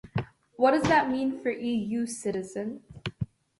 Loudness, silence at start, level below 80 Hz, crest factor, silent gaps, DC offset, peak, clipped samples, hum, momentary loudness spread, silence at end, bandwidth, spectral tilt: -28 LUFS; 0.05 s; -56 dBFS; 18 dB; none; under 0.1%; -10 dBFS; under 0.1%; none; 15 LU; 0.35 s; 11.5 kHz; -5.5 dB/octave